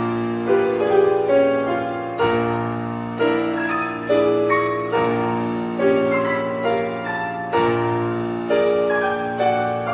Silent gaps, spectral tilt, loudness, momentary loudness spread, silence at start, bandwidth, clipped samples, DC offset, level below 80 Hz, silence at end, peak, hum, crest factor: none; -10.5 dB/octave; -20 LUFS; 7 LU; 0 s; 4 kHz; under 0.1%; under 0.1%; -54 dBFS; 0 s; -4 dBFS; none; 16 dB